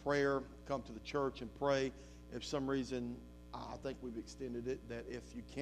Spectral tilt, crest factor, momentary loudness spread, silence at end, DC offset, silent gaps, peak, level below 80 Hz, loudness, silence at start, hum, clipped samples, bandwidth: -5.5 dB/octave; 20 dB; 13 LU; 0 s; under 0.1%; none; -20 dBFS; -58 dBFS; -41 LUFS; 0 s; 60 Hz at -55 dBFS; under 0.1%; 13 kHz